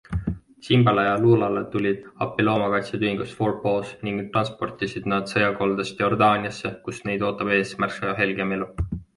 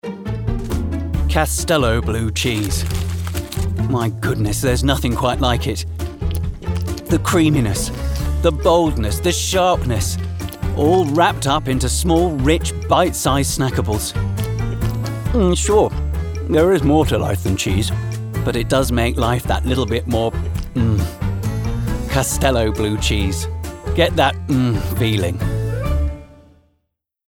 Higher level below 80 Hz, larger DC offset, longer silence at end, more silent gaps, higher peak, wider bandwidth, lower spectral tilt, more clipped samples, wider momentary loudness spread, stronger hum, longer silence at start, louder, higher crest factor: second, -44 dBFS vs -26 dBFS; neither; second, 0.15 s vs 0.95 s; neither; about the same, -4 dBFS vs -2 dBFS; second, 11.5 kHz vs 19 kHz; about the same, -6.5 dB/octave vs -5.5 dB/octave; neither; about the same, 11 LU vs 9 LU; neither; about the same, 0.1 s vs 0.05 s; second, -23 LUFS vs -19 LUFS; about the same, 18 dB vs 16 dB